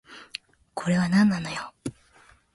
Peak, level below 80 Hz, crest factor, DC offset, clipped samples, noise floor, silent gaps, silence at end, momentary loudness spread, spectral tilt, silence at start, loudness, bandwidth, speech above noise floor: -10 dBFS; -58 dBFS; 16 dB; under 0.1%; under 0.1%; -57 dBFS; none; 0.65 s; 19 LU; -6 dB/octave; 0.1 s; -24 LUFS; 11.5 kHz; 34 dB